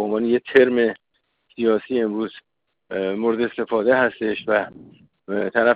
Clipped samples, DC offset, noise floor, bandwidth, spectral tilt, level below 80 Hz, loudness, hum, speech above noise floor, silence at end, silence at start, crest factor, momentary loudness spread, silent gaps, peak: under 0.1%; under 0.1%; -64 dBFS; 5 kHz; -8 dB/octave; -62 dBFS; -21 LUFS; none; 44 dB; 0 s; 0 s; 18 dB; 12 LU; none; -4 dBFS